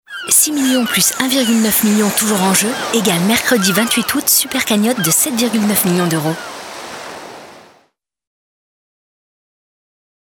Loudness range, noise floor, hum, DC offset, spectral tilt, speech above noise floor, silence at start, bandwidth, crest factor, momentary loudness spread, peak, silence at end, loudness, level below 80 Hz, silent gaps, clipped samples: 11 LU; -58 dBFS; none; under 0.1%; -3 dB/octave; 44 dB; 0.1 s; over 20 kHz; 16 dB; 16 LU; 0 dBFS; 2.65 s; -13 LUFS; -56 dBFS; none; under 0.1%